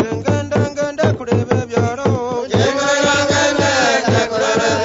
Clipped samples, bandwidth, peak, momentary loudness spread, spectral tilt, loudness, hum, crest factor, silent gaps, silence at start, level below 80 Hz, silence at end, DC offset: under 0.1%; 8 kHz; 0 dBFS; 5 LU; -4.5 dB/octave; -16 LUFS; none; 16 dB; none; 0 s; -44 dBFS; 0 s; under 0.1%